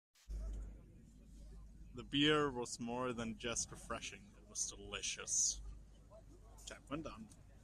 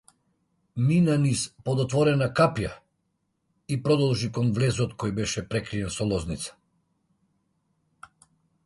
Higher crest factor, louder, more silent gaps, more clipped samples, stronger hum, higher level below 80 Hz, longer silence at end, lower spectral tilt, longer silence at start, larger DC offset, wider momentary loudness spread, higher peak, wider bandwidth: about the same, 22 dB vs 20 dB; second, -40 LUFS vs -25 LUFS; neither; neither; neither; second, -56 dBFS vs -50 dBFS; second, 0 s vs 2.15 s; second, -2.5 dB/octave vs -6 dB/octave; second, 0.25 s vs 0.75 s; neither; first, 25 LU vs 11 LU; second, -22 dBFS vs -8 dBFS; first, 13.5 kHz vs 11.5 kHz